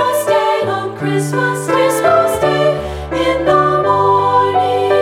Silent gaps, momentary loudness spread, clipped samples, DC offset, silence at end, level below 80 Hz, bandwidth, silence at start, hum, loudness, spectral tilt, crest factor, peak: none; 6 LU; under 0.1%; under 0.1%; 0 s; -38 dBFS; 17.5 kHz; 0 s; none; -14 LUFS; -5 dB/octave; 12 dB; 0 dBFS